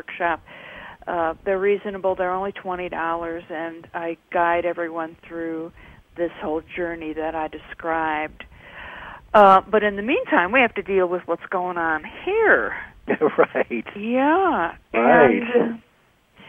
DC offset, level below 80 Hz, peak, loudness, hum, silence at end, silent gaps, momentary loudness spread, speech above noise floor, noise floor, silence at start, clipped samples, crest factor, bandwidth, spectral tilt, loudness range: under 0.1%; -52 dBFS; -2 dBFS; -21 LUFS; none; 0 s; none; 16 LU; 38 dB; -59 dBFS; 0.1 s; under 0.1%; 20 dB; 7.6 kHz; -7.5 dB/octave; 9 LU